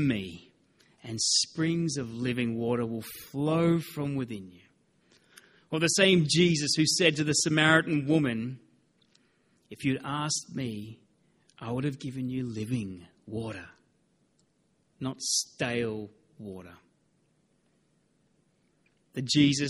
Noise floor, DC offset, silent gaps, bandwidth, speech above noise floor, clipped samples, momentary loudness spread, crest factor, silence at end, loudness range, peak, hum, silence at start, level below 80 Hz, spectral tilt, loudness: -71 dBFS; under 0.1%; none; 14.5 kHz; 43 dB; under 0.1%; 20 LU; 24 dB; 0 s; 12 LU; -8 dBFS; none; 0 s; -64 dBFS; -4 dB/octave; -28 LUFS